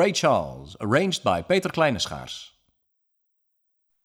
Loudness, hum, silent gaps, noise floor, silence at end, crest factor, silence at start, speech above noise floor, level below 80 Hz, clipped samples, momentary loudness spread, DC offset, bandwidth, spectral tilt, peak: -23 LUFS; none; none; -74 dBFS; 1.55 s; 18 dB; 0 s; 50 dB; -54 dBFS; under 0.1%; 15 LU; under 0.1%; 16 kHz; -4.5 dB/octave; -8 dBFS